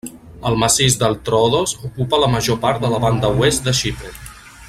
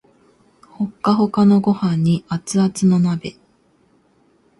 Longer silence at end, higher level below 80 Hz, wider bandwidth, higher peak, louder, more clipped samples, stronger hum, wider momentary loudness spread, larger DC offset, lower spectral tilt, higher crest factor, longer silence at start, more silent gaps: second, 0 s vs 1.3 s; first, -38 dBFS vs -56 dBFS; first, 16 kHz vs 11.5 kHz; about the same, 0 dBFS vs -2 dBFS; about the same, -17 LUFS vs -17 LUFS; neither; neither; first, 16 LU vs 13 LU; neither; second, -4 dB/octave vs -7 dB/octave; about the same, 18 dB vs 16 dB; second, 0.05 s vs 0.8 s; neither